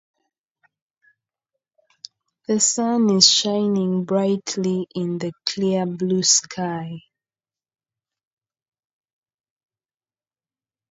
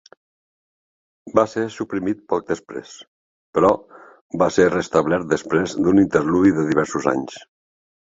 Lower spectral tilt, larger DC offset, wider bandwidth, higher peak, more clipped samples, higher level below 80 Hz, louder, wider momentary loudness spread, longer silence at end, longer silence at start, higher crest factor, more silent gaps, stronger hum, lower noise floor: second, -3.5 dB/octave vs -6 dB/octave; neither; about the same, 8 kHz vs 7.8 kHz; about the same, 0 dBFS vs -2 dBFS; neither; second, -70 dBFS vs -52 dBFS; about the same, -19 LUFS vs -20 LUFS; first, 14 LU vs 11 LU; first, 3.9 s vs 0.8 s; first, 2.5 s vs 1.25 s; about the same, 24 dB vs 20 dB; second, none vs 3.07-3.53 s, 4.21-4.30 s; neither; about the same, under -90 dBFS vs under -90 dBFS